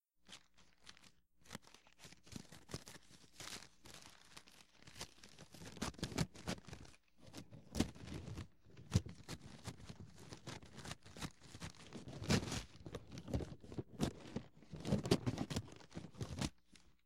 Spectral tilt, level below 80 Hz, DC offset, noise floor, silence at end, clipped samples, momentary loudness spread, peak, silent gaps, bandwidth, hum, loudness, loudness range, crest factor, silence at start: -5 dB/octave; -60 dBFS; under 0.1%; -70 dBFS; 0 s; under 0.1%; 19 LU; -18 dBFS; none; 16.5 kHz; none; -46 LUFS; 12 LU; 28 dB; 0 s